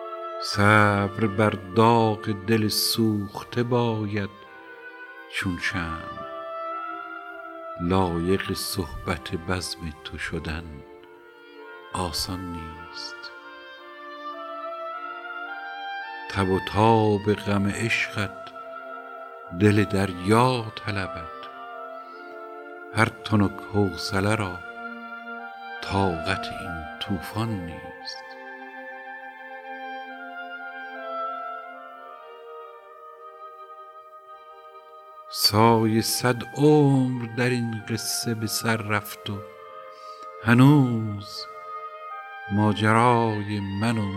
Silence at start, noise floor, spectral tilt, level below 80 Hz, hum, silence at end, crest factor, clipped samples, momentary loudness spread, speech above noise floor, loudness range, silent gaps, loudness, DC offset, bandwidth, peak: 0 s; -48 dBFS; -5.5 dB/octave; -52 dBFS; none; 0 s; 24 dB; under 0.1%; 22 LU; 25 dB; 14 LU; none; -25 LUFS; under 0.1%; 16 kHz; -2 dBFS